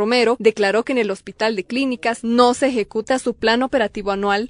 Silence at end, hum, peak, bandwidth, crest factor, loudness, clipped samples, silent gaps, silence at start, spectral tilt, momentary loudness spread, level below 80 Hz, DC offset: 0 s; none; 0 dBFS; 11 kHz; 18 dB; -19 LUFS; under 0.1%; none; 0 s; -4 dB/octave; 6 LU; -50 dBFS; under 0.1%